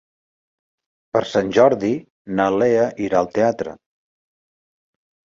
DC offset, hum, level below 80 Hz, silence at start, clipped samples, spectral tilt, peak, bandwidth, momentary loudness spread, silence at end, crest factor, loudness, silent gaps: under 0.1%; none; -58 dBFS; 1.15 s; under 0.1%; -6 dB/octave; -2 dBFS; 7.6 kHz; 11 LU; 1.65 s; 20 dB; -19 LUFS; 2.10-2.25 s